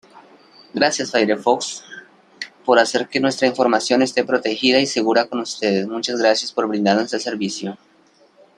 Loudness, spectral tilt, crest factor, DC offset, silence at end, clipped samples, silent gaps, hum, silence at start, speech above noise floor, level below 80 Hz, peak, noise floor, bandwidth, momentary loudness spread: -19 LUFS; -3.5 dB/octave; 20 dB; under 0.1%; 0.8 s; under 0.1%; none; none; 0.15 s; 36 dB; -66 dBFS; 0 dBFS; -54 dBFS; 11 kHz; 12 LU